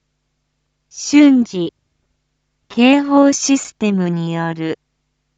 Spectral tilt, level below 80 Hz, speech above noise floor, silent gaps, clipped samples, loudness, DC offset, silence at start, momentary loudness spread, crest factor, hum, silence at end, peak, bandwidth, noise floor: -4.5 dB/octave; -64 dBFS; 55 dB; none; under 0.1%; -15 LUFS; under 0.1%; 0.95 s; 15 LU; 16 dB; none; 0.65 s; 0 dBFS; 8.2 kHz; -69 dBFS